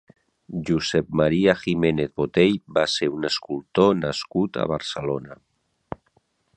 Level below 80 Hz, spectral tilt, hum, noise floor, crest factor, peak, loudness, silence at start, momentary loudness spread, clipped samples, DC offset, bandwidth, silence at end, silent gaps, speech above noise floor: -52 dBFS; -5.5 dB/octave; none; -66 dBFS; 22 dB; -2 dBFS; -23 LUFS; 0.5 s; 12 LU; under 0.1%; under 0.1%; 11 kHz; 1.25 s; none; 44 dB